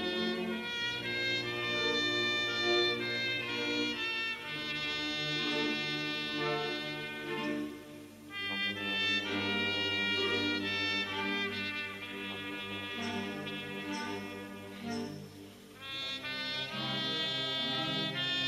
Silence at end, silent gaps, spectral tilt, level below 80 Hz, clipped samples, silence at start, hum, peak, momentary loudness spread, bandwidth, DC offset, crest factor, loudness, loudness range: 0 s; none; -3.5 dB/octave; -70 dBFS; under 0.1%; 0 s; 50 Hz at -60 dBFS; -18 dBFS; 10 LU; 15 kHz; under 0.1%; 18 dB; -33 LUFS; 8 LU